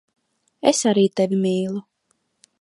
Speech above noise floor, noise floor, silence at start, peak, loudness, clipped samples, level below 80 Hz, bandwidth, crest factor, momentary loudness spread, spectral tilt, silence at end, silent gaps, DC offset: 51 dB; -70 dBFS; 0.65 s; -2 dBFS; -20 LUFS; under 0.1%; -70 dBFS; 11.5 kHz; 20 dB; 9 LU; -5 dB/octave; 0.8 s; none; under 0.1%